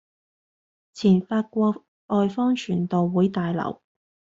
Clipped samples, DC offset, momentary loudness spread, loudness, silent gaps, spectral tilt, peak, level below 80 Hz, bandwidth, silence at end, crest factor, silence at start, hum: under 0.1%; under 0.1%; 8 LU; -23 LUFS; 1.88-2.08 s; -7.5 dB/octave; -8 dBFS; -62 dBFS; 7.6 kHz; 0.65 s; 16 dB; 0.95 s; none